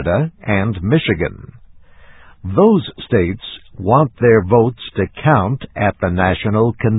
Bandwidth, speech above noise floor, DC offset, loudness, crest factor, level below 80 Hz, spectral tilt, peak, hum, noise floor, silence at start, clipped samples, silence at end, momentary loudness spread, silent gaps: 4 kHz; 26 dB; under 0.1%; -16 LUFS; 16 dB; -36 dBFS; -11.5 dB/octave; 0 dBFS; none; -41 dBFS; 0 s; under 0.1%; 0 s; 10 LU; none